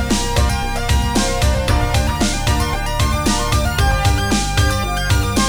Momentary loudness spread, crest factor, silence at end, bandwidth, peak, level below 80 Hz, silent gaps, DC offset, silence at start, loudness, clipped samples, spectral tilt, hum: 3 LU; 14 dB; 0 s; over 20 kHz; -2 dBFS; -20 dBFS; none; 1%; 0 s; -17 LUFS; under 0.1%; -4.5 dB/octave; none